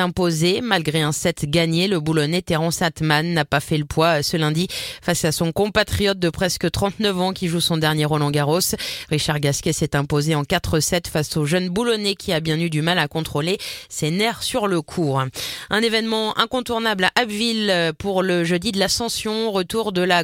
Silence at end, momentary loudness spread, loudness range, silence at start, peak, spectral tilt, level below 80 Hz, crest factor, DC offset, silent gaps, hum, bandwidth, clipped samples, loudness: 0 s; 4 LU; 2 LU; 0 s; -2 dBFS; -4.5 dB/octave; -44 dBFS; 18 dB; under 0.1%; none; none; 16.5 kHz; under 0.1%; -20 LUFS